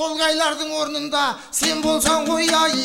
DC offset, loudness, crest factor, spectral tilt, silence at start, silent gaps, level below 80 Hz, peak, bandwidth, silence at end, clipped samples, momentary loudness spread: under 0.1%; -19 LUFS; 14 dB; -1.5 dB/octave; 0 s; none; -50 dBFS; -6 dBFS; 16.5 kHz; 0 s; under 0.1%; 6 LU